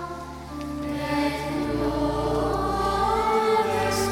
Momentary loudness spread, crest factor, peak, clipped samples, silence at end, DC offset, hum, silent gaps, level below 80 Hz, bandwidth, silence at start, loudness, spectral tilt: 12 LU; 16 dB; -10 dBFS; under 0.1%; 0 s; under 0.1%; none; none; -40 dBFS; 17.5 kHz; 0 s; -25 LUFS; -5 dB/octave